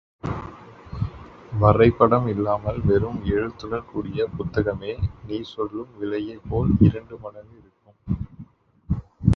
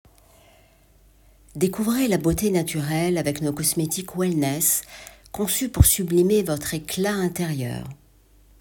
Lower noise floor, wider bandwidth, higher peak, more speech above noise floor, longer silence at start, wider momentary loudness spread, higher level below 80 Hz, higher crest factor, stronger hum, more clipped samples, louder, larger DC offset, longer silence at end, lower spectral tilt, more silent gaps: second, -46 dBFS vs -55 dBFS; second, 6.2 kHz vs 18.5 kHz; about the same, 0 dBFS vs 0 dBFS; second, 24 dB vs 33 dB; second, 0.25 s vs 1.55 s; first, 17 LU vs 12 LU; about the same, -36 dBFS vs -36 dBFS; about the same, 22 dB vs 22 dB; neither; neither; about the same, -23 LUFS vs -22 LUFS; neither; second, 0 s vs 0.65 s; first, -9.5 dB/octave vs -4.5 dB/octave; neither